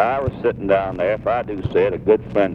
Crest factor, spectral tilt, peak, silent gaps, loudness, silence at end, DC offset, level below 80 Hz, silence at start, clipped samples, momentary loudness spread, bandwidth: 16 dB; -9 dB/octave; -2 dBFS; none; -20 LUFS; 0 s; under 0.1%; -42 dBFS; 0 s; under 0.1%; 5 LU; 5.6 kHz